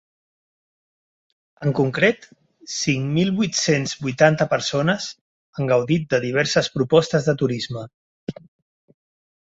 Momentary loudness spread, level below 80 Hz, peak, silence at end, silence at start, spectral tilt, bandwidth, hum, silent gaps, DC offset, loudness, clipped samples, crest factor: 16 LU; -58 dBFS; -2 dBFS; 1.15 s; 1.6 s; -5 dB/octave; 8 kHz; none; 5.21-5.53 s, 7.94-8.27 s; under 0.1%; -20 LUFS; under 0.1%; 20 dB